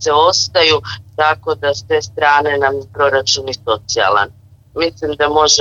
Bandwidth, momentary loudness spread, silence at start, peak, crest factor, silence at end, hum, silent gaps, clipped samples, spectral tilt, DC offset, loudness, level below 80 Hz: 8 kHz; 8 LU; 0 s; 0 dBFS; 14 dB; 0 s; none; none; under 0.1%; -2 dB/octave; under 0.1%; -14 LUFS; -46 dBFS